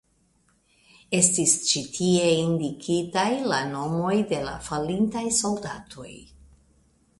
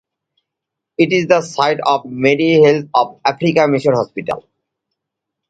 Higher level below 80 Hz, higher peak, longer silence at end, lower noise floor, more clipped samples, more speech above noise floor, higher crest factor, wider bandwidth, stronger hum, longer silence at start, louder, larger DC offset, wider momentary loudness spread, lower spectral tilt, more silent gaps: about the same, -56 dBFS vs -60 dBFS; second, -4 dBFS vs 0 dBFS; second, 0.95 s vs 1.1 s; second, -65 dBFS vs -81 dBFS; neither; second, 41 dB vs 67 dB; first, 22 dB vs 16 dB; first, 11.5 kHz vs 9 kHz; neither; about the same, 1.1 s vs 1 s; second, -24 LUFS vs -15 LUFS; neither; about the same, 11 LU vs 11 LU; second, -3.5 dB/octave vs -6 dB/octave; neither